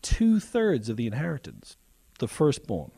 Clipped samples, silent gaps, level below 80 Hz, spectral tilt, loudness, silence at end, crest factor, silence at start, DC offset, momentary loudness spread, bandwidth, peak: under 0.1%; none; -38 dBFS; -6 dB/octave; -27 LUFS; 0.1 s; 16 dB; 0.05 s; under 0.1%; 12 LU; 13.5 kHz; -12 dBFS